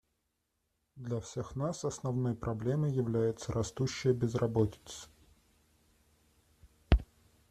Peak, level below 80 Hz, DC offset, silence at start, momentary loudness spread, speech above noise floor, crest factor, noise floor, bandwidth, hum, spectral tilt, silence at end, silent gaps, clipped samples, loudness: -8 dBFS; -44 dBFS; under 0.1%; 0.95 s; 11 LU; 48 dB; 26 dB; -82 dBFS; 13.5 kHz; none; -6.5 dB/octave; 0.45 s; none; under 0.1%; -34 LUFS